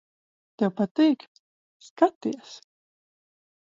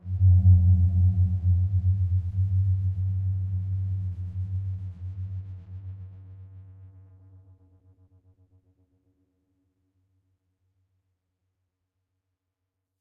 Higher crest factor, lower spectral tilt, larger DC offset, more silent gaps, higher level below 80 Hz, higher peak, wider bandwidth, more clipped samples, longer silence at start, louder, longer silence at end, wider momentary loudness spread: about the same, 22 dB vs 18 dB; second, -6.5 dB/octave vs -12 dB/octave; neither; first, 0.91-0.95 s, 1.28-1.80 s, 1.90-1.96 s, 2.15-2.21 s vs none; second, -80 dBFS vs -48 dBFS; first, -6 dBFS vs -10 dBFS; first, 7.6 kHz vs 0.8 kHz; neither; first, 0.6 s vs 0.05 s; about the same, -25 LUFS vs -25 LUFS; second, 1.05 s vs 6.1 s; second, 18 LU vs 22 LU